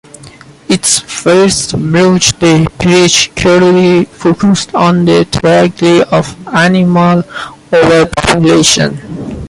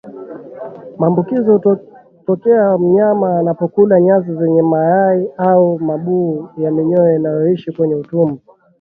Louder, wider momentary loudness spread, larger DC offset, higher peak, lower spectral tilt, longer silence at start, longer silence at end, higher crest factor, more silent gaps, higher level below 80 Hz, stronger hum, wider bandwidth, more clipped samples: first, -8 LUFS vs -14 LUFS; second, 6 LU vs 14 LU; neither; about the same, 0 dBFS vs 0 dBFS; second, -4.5 dB/octave vs -12.5 dB/octave; first, 0.25 s vs 0.05 s; second, 0 s vs 0.45 s; second, 8 dB vs 14 dB; neither; first, -34 dBFS vs -60 dBFS; neither; first, 11.5 kHz vs 3.8 kHz; neither